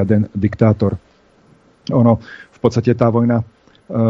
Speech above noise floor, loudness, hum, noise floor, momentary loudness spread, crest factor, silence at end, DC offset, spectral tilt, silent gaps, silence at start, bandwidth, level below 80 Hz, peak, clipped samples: 36 dB; -16 LUFS; none; -51 dBFS; 16 LU; 16 dB; 0 s; under 0.1%; -9 dB/octave; none; 0 s; 7.2 kHz; -46 dBFS; 0 dBFS; under 0.1%